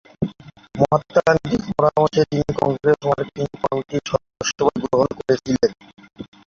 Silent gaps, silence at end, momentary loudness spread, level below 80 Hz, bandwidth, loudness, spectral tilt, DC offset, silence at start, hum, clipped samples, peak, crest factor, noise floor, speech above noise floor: none; 0.25 s; 10 LU; -48 dBFS; 7.6 kHz; -20 LUFS; -5.5 dB/octave; under 0.1%; 0.2 s; none; under 0.1%; -2 dBFS; 18 dB; -40 dBFS; 21 dB